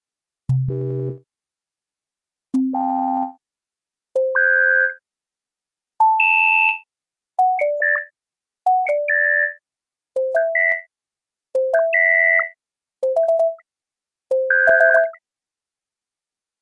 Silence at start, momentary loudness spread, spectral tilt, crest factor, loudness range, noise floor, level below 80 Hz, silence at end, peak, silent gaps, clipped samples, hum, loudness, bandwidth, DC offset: 0.5 s; 13 LU; -7.5 dB/octave; 18 dB; 7 LU; under -90 dBFS; -60 dBFS; 1.5 s; -2 dBFS; none; under 0.1%; none; -18 LUFS; 10.5 kHz; under 0.1%